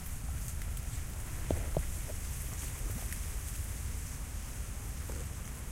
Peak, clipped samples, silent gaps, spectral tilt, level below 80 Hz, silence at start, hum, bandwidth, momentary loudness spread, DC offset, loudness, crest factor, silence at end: -16 dBFS; under 0.1%; none; -4.5 dB/octave; -40 dBFS; 0 s; none; 16 kHz; 5 LU; under 0.1%; -40 LUFS; 22 dB; 0 s